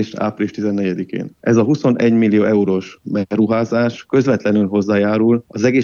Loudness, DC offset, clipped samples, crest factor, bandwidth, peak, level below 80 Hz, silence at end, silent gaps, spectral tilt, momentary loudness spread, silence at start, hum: -16 LUFS; under 0.1%; under 0.1%; 14 dB; 7 kHz; -2 dBFS; -60 dBFS; 0 s; none; -7.5 dB/octave; 8 LU; 0 s; none